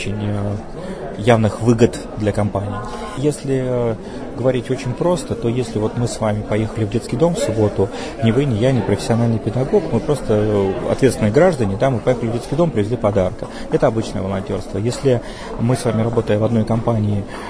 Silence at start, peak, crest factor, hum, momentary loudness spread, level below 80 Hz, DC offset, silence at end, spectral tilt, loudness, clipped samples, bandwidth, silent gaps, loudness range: 0 s; 0 dBFS; 18 dB; none; 8 LU; -36 dBFS; 0.4%; 0 s; -7 dB/octave; -19 LUFS; under 0.1%; 11 kHz; none; 3 LU